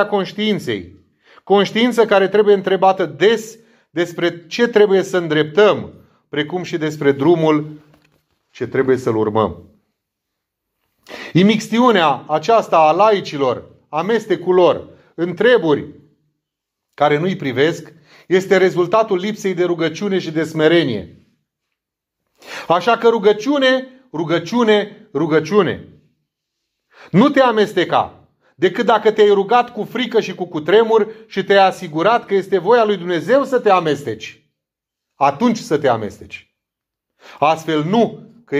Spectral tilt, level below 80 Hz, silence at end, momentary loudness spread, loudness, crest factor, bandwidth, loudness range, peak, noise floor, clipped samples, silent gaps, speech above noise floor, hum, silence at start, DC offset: -6 dB/octave; -64 dBFS; 0 s; 12 LU; -16 LUFS; 16 dB; 13.5 kHz; 4 LU; 0 dBFS; -82 dBFS; under 0.1%; none; 67 dB; none; 0 s; under 0.1%